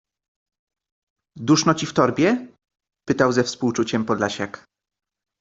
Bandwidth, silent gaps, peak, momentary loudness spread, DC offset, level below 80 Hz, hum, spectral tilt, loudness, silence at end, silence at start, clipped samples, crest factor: 8 kHz; none; -2 dBFS; 12 LU; under 0.1%; -60 dBFS; none; -5 dB/octave; -21 LUFS; 0.85 s; 1.35 s; under 0.1%; 20 dB